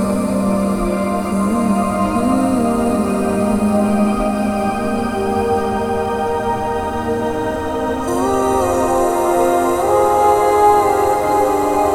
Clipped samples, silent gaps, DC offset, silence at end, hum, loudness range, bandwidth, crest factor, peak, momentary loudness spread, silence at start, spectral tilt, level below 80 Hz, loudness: under 0.1%; none; under 0.1%; 0 s; none; 5 LU; 18 kHz; 14 dB; -2 dBFS; 6 LU; 0 s; -6 dB/octave; -36 dBFS; -16 LUFS